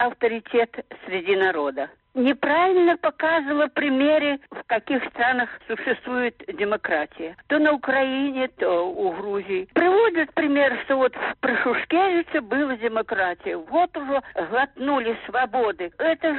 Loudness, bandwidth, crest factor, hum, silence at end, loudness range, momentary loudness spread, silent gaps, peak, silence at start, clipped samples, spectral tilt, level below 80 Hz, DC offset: -23 LUFS; 4.3 kHz; 14 dB; none; 0 s; 3 LU; 8 LU; none; -8 dBFS; 0 s; under 0.1%; -1.5 dB/octave; -62 dBFS; under 0.1%